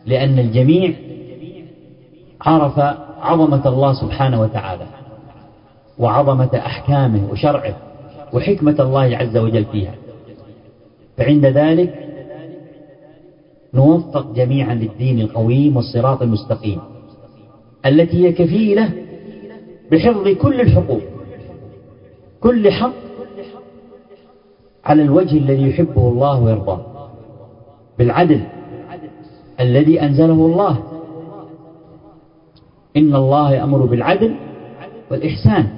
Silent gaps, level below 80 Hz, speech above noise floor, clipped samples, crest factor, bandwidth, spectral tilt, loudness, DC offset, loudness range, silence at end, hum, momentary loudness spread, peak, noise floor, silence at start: none; -38 dBFS; 36 dB; under 0.1%; 16 dB; 5.4 kHz; -12.5 dB/octave; -15 LUFS; under 0.1%; 3 LU; 0 s; none; 22 LU; 0 dBFS; -49 dBFS; 0.05 s